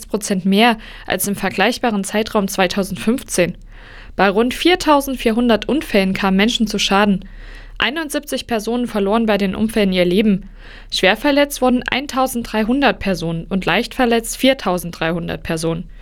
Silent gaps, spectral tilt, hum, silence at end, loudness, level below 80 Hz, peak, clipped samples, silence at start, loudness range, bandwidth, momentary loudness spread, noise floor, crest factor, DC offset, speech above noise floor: none; -4.5 dB/octave; none; 0 s; -17 LUFS; -38 dBFS; 0 dBFS; under 0.1%; 0 s; 2 LU; 18.5 kHz; 7 LU; -36 dBFS; 16 dB; under 0.1%; 19 dB